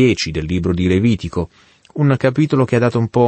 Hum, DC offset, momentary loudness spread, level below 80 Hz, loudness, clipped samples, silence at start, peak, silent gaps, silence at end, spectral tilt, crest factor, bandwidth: none; under 0.1%; 9 LU; -38 dBFS; -17 LUFS; under 0.1%; 0 s; -2 dBFS; none; 0 s; -7 dB/octave; 14 dB; 8.8 kHz